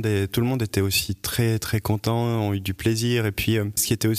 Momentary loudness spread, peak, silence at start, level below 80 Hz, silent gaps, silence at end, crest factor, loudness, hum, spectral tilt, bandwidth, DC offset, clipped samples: 3 LU; -8 dBFS; 0 s; -46 dBFS; none; 0 s; 16 dB; -23 LUFS; none; -5 dB/octave; 15.5 kHz; under 0.1%; under 0.1%